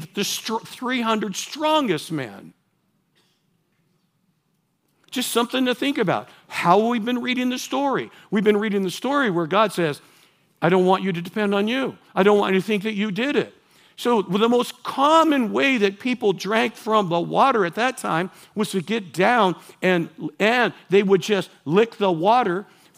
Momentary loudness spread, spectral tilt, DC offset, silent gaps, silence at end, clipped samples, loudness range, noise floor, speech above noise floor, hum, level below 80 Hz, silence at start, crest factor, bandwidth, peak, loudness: 9 LU; -5 dB/octave; under 0.1%; none; 0.35 s; under 0.1%; 7 LU; -69 dBFS; 48 dB; none; -78 dBFS; 0 s; 20 dB; 16 kHz; -2 dBFS; -21 LUFS